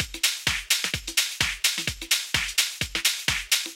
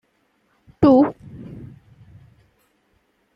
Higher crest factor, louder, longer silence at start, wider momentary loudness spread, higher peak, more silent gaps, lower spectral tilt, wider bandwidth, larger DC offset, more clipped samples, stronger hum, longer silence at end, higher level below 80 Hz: about the same, 22 dB vs 20 dB; second, -24 LUFS vs -16 LUFS; second, 0 s vs 0.8 s; second, 3 LU vs 25 LU; second, -6 dBFS vs -2 dBFS; neither; second, 0 dB/octave vs -9.5 dB/octave; first, 17 kHz vs 5.6 kHz; neither; neither; neither; second, 0 s vs 1.7 s; first, -46 dBFS vs -54 dBFS